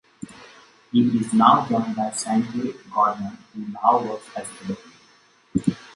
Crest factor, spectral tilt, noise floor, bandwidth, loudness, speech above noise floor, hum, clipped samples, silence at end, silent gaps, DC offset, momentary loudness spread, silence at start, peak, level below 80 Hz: 22 dB; -5.5 dB/octave; -56 dBFS; 11.5 kHz; -22 LUFS; 35 dB; none; under 0.1%; 0.1 s; none; under 0.1%; 18 LU; 0.2 s; 0 dBFS; -58 dBFS